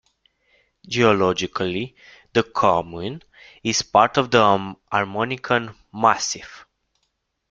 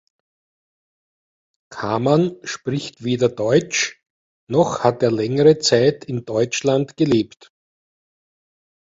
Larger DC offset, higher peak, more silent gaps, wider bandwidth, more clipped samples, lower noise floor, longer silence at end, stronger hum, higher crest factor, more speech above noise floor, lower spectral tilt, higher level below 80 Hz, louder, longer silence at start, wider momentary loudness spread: neither; about the same, -2 dBFS vs -2 dBFS; second, none vs 4.10-4.47 s; first, 9.2 kHz vs 7.8 kHz; neither; second, -74 dBFS vs under -90 dBFS; second, 0.9 s vs 1.75 s; neither; about the same, 20 dB vs 20 dB; second, 53 dB vs over 72 dB; about the same, -4 dB/octave vs -5 dB/octave; about the same, -58 dBFS vs -58 dBFS; about the same, -21 LUFS vs -19 LUFS; second, 0.85 s vs 1.7 s; first, 15 LU vs 11 LU